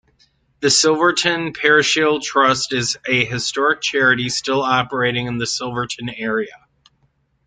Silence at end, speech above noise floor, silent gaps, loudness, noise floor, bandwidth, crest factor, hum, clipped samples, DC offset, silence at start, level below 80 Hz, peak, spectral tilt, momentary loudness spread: 0.9 s; 45 dB; none; -17 LUFS; -63 dBFS; 9.6 kHz; 18 dB; none; under 0.1%; under 0.1%; 0.6 s; -56 dBFS; 0 dBFS; -3 dB/octave; 9 LU